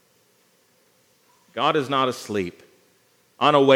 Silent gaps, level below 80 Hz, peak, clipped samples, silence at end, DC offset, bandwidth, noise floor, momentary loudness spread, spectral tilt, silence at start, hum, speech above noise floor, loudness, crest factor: none; -74 dBFS; -2 dBFS; under 0.1%; 0 s; under 0.1%; 16 kHz; -62 dBFS; 12 LU; -5 dB/octave; 1.55 s; 60 Hz at -60 dBFS; 42 dB; -22 LUFS; 22 dB